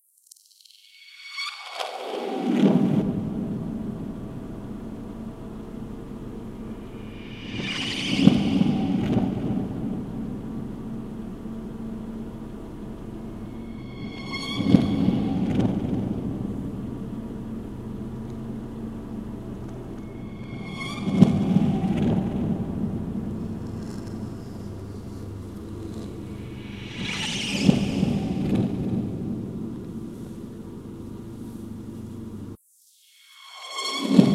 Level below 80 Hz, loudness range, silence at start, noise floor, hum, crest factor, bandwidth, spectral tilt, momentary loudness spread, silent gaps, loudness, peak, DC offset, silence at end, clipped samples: -46 dBFS; 12 LU; 0.75 s; -59 dBFS; none; 26 dB; 13 kHz; -6.5 dB/octave; 17 LU; none; -28 LUFS; 0 dBFS; 0.2%; 0 s; under 0.1%